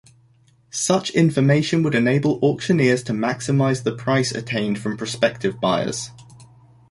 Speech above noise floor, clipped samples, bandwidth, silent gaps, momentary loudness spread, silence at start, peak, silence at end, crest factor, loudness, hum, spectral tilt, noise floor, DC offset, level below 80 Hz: 37 dB; under 0.1%; 11.5 kHz; none; 7 LU; 0.75 s; -4 dBFS; 0.45 s; 16 dB; -20 LUFS; none; -5.5 dB/octave; -56 dBFS; under 0.1%; -56 dBFS